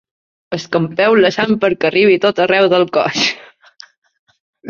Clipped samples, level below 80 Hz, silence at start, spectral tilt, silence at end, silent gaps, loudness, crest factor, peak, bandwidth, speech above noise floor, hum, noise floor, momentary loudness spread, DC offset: under 0.1%; -58 dBFS; 0.5 s; -4.5 dB/octave; 0 s; 3.98-4.02 s, 4.19-4.27 s, 4.40-4.53 s; -13 LUFS; 14 dB; 0 dBFS; 7.4 kHz; 30 dB; none; -43 dBFS; 8 LU; under 0.1%